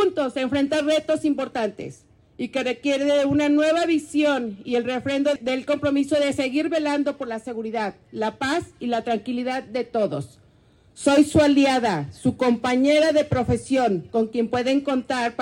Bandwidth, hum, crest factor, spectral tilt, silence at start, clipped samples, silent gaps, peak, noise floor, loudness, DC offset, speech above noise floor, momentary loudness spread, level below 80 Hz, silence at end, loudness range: 12 kHz; none; 16 dB; -5.5 dB/octave; 0 s; under 0.1%; none; -6 dBFS; -56 dBFS; -22 LUFS; under 0.1%; 34 dB; 10 LU; -56 dBFS; 0 s; 6 LU